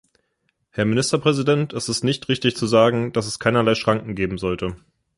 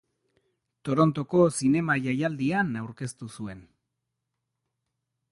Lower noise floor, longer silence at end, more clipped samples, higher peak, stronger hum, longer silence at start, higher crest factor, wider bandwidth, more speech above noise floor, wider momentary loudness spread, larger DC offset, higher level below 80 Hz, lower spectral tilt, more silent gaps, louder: second, -71 dBFS vs -83 dBFS; second, 0.4 s vs 1.7 s; neither; first, -2 dBFS vs -8 dBFS; neither; about the same, 0.75 s vs 0.85 s; about the same, 18 dB vs 20 dB; about the same, 11.5 kHz vs 11.5 kHz; second, 51 dB vs 57 dB; second, 8 LU vs 16 LU; neither; first, -48 dBFS vs -62 dBFS; second, -5 dB/octave vs -6.5 dB/octave; neither; first, -20 LUFS vs -25 LUFS